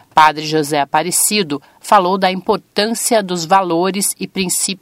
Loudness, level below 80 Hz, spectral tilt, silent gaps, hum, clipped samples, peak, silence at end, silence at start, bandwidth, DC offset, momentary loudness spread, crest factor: -15 LUFS; -58 dBFS; -3 dB/octave; none; none; 0.1%; 0 dBFS; 0.05 s; 0.15 s; 16.5 kHz; under 0.1%; 6 LU; 16 dB